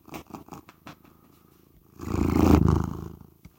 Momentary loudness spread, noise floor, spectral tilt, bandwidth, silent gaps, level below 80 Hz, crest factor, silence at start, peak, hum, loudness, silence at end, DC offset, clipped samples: 24 LU; -58 dBFS; -8 dB/octave; 16.5 kHz; none; -38 dBFS; 22 dB; 0.1 s; -6 dBFS; none; -23 LUFS; 0.45 s; under 0.1%; under 0.1%